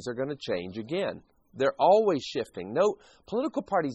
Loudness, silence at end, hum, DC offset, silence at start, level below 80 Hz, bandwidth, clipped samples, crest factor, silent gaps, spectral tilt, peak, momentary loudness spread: -28 LUFS; 0 s; none; under 0.1%; 0 s; -66 dBFS; 8.2 kHz; under 0.1%; 18 dB; none; -5.5 dB/octave; -10 dBFS; 12 LU